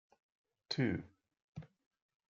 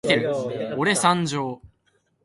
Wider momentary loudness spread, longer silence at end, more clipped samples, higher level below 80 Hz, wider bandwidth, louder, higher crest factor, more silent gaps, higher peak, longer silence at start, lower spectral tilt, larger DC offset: first, 19 LU vs 11 LU; about the same, 0.65 s vs 0.6 s; neither; second, -74 dBFS vs -60 dBFS; second, 7.4 kHz vs 11.5 kHz; second, -39 LUFS vs -23 LUFS; about the same, 22 dB vs 20 dB; first, 1.44-1.53 s vs none; second, -22 dBFS vs -4 dBFS; first, 0.7 s vs 0.05 s; about the same, -5 dB/octave vs -4 dB/octave; neither